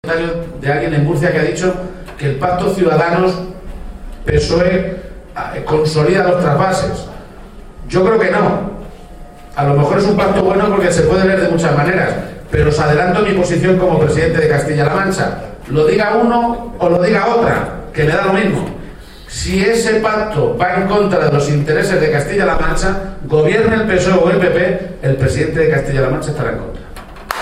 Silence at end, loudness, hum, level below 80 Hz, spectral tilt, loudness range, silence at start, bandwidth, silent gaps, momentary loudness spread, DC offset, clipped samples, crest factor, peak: 0 s; -14 LUFS; none; -30 dBFS; -6.5 dB/octave; 3 LU; 0.05 s; 14.5 kHz; none; 12 LU; under 0.1%; under 0.1%; 14 dB; 0 dBFS